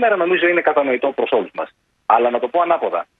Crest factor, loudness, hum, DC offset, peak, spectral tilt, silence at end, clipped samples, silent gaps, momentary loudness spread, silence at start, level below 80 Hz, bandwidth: 16 dB; -17 LUFS; none; under 0.1%; 0 dBFS; -7 dB/octave; 0.15 s; under 0.1%; none; 13 LU; 0 s; -68 dBFS; 4.1 kHz